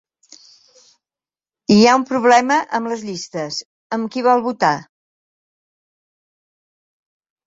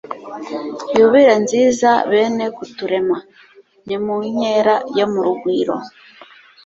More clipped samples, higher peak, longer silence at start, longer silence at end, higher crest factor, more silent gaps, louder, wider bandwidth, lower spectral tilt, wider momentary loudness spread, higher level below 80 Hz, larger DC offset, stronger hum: neither; about the same, 0 dBFS vs -2 dBFS; first, 1.7 s vs 0.1 s; first, 2.65 s vs 0.4 s; about the same, 20 dB vs 16 dB; first, 3.65-3.90 s vs none; about the same, -17 LUFS vs -16 LUFS; about the same, 7.8 kHz vs 8 kHz; about the same, -4.5 dB/octave vs -4.5 dB/octave; about the same, 14 LU vs 15 LU; about the same, -62 dBFS vs -60 dBFS; neither; neither